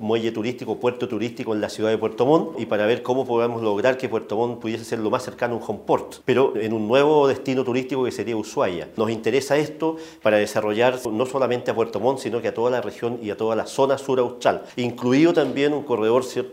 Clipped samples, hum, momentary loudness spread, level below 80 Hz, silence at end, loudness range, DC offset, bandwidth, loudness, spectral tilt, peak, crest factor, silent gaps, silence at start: under 0.1%; none; 8 LU; -64 dBFS; 0 s; 2 LU; under 0.1%; 16 kHz; -22 LUFS; -5.5 dB/octave; -4 dBFS; 18 dB; none; 0 s